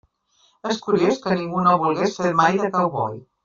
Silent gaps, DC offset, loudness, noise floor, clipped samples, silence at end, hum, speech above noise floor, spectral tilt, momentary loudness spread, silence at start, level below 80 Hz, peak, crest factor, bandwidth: none; under 0.1%; -20 LUFS; -62 dBFS; under 0.1%; 0.25 s; none; 42 dB; -6 dB/octave; 9 LU; 0.65 s; -60 dBFS; -4 dBFS; 18 dB; 7.6 kHz